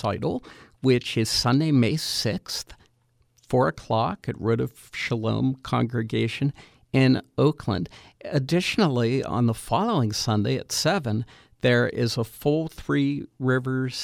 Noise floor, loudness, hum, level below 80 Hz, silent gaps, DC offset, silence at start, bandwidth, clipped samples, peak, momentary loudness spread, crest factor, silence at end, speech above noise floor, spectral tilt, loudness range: -66 dBFS; -25 LUFS; none; -52 dBFS; none; under 0.1%; 0 s; 16 kHz; under 0.1%; -6 dBFS; 8 LU; 18 dB; 0 s; 42 dB; -5.5 dB/octave; 3 LU